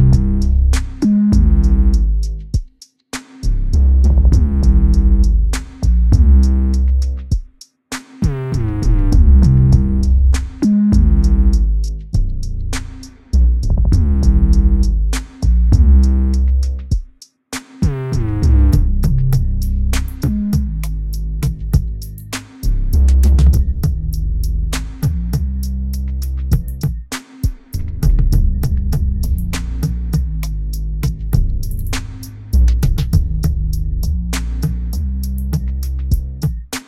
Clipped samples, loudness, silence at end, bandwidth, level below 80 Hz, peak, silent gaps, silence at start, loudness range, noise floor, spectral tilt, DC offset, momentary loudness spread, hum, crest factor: under 0.1%; -17 LUFS; 0.05 s; 14 kHz; -14 dBFS; 0 dBFS; none; 0 s; 7 LU; -42 dBFS; -7 dB/octave; under 0.1%; 11 LU; none; 14 dB